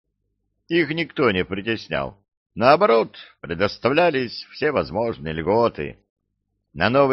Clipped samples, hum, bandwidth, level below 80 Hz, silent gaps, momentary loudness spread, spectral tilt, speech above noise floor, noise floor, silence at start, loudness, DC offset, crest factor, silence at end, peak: under 0.1%; none; 6.2 kHz; -50 dBFS; 2.37-2.46 s, 6.10-6.16 s; 14 LU; -7.5 dB/octave; 55 dB; -75 dBFS; 0.7 s; -21 LUFS; under 0.1%; 20 dB; 0 s; -2 dBFS